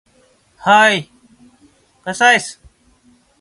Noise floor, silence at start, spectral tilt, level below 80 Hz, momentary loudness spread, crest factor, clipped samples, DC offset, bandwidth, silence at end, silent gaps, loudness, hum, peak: -55 dBFS; 0.65 s; -2.5 dB/octave; -58 dBFS; 18 LU; 18 dB; under 0.1%; under 0.1%; 11.5 kHz; 0.9 s; none; -13 LUFS; none; 0 dBFS